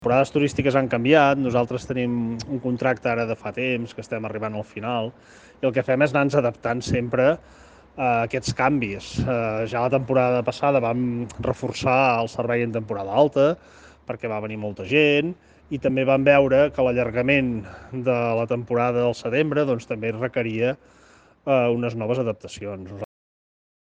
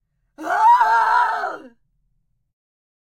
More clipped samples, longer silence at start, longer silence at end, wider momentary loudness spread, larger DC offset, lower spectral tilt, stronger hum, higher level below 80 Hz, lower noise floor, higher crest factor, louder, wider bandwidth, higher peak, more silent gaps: neither; second, 0 s vs 0.4 s; second, 0.8 s vs 1.5 s; second, 12 LU vs 18 LU; neither; first, -6.5 dB/octave vs -1.5 dB/octave; neither; first, -50 dBFS vs -68 dBFS; second, -54 dBFS vs -69 dBFS; about the same, 20 dB vs 16 dB; second, -22 LUFS vs -16 LUFS; second, 9.4 kHz vs 14.5 kHz; about the same, -2 dBFS vs -4 dBFS; neither